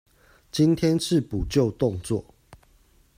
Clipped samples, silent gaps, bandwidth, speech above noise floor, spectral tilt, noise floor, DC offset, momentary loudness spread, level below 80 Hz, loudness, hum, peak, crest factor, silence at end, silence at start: under 0.1%; none; 16 kHz; 36 dB; -6.5 dB/octave; -59 dBFS; under 0.1%; 10 LU; -44 dBFS; -24 LUFS; none; -8 dBFS; 18 dB; 0.6 s; 0.55 s